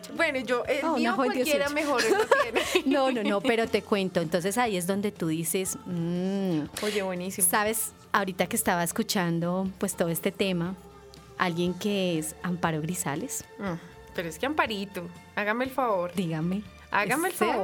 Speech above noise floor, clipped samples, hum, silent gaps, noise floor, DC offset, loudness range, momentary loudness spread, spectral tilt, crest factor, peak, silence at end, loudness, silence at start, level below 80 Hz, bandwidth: 21 dB; under 0.1%; none; none; -49 dBFS; under 0.1%; 5 LU; 9 LU; -4 dB/octave; 20 dB; -6 dBFS; 0 s; -27 LUFS; 0 s; -60 dBFS; over 20 kHz